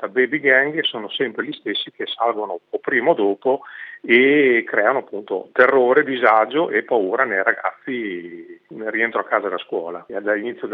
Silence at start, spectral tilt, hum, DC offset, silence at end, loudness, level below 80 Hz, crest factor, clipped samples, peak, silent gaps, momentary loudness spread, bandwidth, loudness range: 0 s; -7.5 dB/octave; none; under 0.1%; 0 s; -19 LUFS; -82 dBFS; 20 dB; under 0.1%; 0 dBFS; none; 12 LU; 4.8 kHz; 6 LU